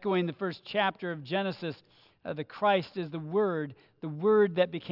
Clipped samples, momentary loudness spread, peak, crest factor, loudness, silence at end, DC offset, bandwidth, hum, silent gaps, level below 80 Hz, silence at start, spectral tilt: under 0.1%; 15 LU; -12 dBFS; 18 dB; -30 LUFS; 0 s; under 0.1%; 5.8 kHz; none; none; -78 dBFS; 0 s; -8.5 dB/octave